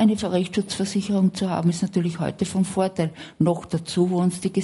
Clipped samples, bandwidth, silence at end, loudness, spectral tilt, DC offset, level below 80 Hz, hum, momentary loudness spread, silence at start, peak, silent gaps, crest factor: under 0.1%; 11.5 kHz; 0 s; -23 LUFS; -6.5 dB/octave; under 0.1%; -54 dBFS; none; 5 LU; 0 s; -8 dBFS; none; 14 dB